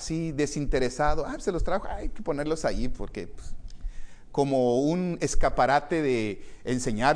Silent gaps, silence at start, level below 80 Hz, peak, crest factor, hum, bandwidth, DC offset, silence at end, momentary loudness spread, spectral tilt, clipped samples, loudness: none; 0 s; -34 dBFS; -8 dBFS; 18 dB; none; 10.5 kHz; under 0.1%; 0 s; 17 LU; -5.5 dB/octave; under 0.1%; -28 LUFS